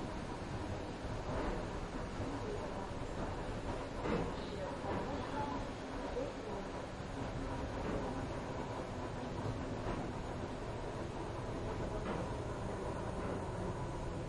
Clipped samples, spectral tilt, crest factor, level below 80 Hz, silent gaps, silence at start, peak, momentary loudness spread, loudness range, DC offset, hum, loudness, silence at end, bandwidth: under 0.1%; -6.5 dB/octave; 16 dB; -50 dBFS; none; 0 s; -24 dBFS; 3 LU; 1 LU; under 0.1%; none; -42 LUFS; 0 s; 11.5 kHz